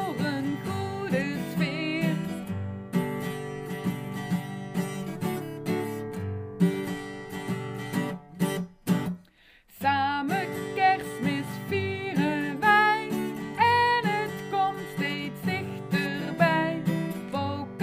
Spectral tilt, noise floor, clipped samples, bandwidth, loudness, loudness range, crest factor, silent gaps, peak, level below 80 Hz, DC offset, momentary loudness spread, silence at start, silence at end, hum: -6 dB/octave; -58 dBFS; under 0.1%; 15.5 kHz; -28 LUFS; 7 LU; 20 dB; none; -8 dBFS; -62 dBFS; under 0.1%; 10 LU; 0 s; 0 s; none